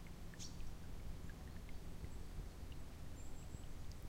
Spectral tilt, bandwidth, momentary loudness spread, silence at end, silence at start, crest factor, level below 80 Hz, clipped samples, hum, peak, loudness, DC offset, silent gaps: -5 dB/octave; 16 kHz; 2 LU; 0 s; 0 s; 12 dB; -52 dBFS; under 0.1%; none; -36 dBFS; -54 LUFS; under 0.1%; none